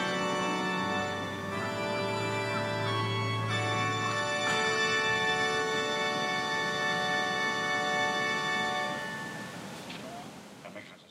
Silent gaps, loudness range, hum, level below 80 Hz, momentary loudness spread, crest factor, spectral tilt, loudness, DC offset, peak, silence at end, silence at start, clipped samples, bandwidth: none; 3 LU; none; -66 dBFS; 14 LU; 14 dB; -3.5 dB/octave; -30 LUFS; under 0.1%; -16 dBFS; 0.05 s; 0 s; under 0.1%; 16 kHz